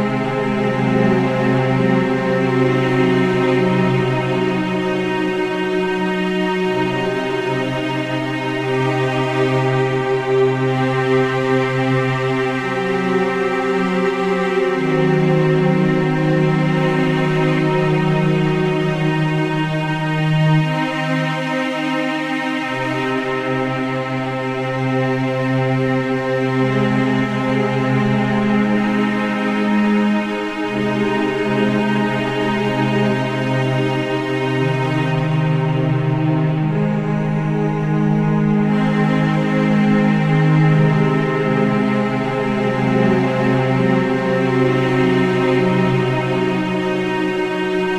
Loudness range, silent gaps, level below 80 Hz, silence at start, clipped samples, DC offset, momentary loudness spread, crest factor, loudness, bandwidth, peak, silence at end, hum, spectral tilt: 3 LU; none; -48 dBFS; 0 s; under 0.1%; under 0.1%; 4 LU; 14 dB; -17 LUFS; 11 kHz; -4 dBFS; 0 s; none; -7.5 dB/octave